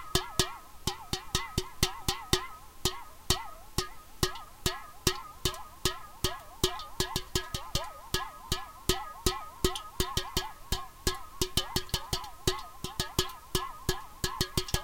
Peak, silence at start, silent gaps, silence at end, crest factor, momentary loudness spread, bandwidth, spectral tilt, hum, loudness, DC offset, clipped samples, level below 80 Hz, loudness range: -4 dBFS; 0 s; none; 0 s; 30 dB; 5 LU; 17 kHz; -3 dB/octave; none; -33 LUFS; under 0.1%; under 0.1%; -42 dBFS; 1 LU